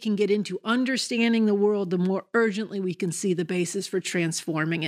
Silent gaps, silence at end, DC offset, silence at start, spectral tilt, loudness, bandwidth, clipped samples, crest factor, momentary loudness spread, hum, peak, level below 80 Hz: none; 0 s; under 0.1%; 0 s; -5 dB/octave; -25 LUFS; 15 kHz; under 0.1%; 14 dB; 6 LU; none; -10 dBFS; -80 dBFS